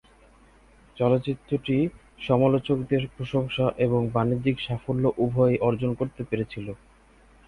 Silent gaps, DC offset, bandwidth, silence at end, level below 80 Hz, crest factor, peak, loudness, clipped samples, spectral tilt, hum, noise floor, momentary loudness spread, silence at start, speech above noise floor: none; under 0.1%; 10.5 kHz; 0.7 s; -52 dBFS; 18 dB; -8 dBFS; -25 LUFS; under 0.1%; -9 dB/octave; none; -55 dBFS; 8 LU; 0.95 s; 31 dB